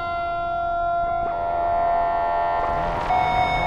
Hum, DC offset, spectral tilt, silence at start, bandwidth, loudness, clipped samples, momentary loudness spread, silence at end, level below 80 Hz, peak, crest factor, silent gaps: none; under 0.1%; -6 dB/octave; 0 s; 7 kHz; -23 LUFS; under 0.1%; 4 LU; 0 s; -38 dBFS; -10 dBFS; 12 dB; none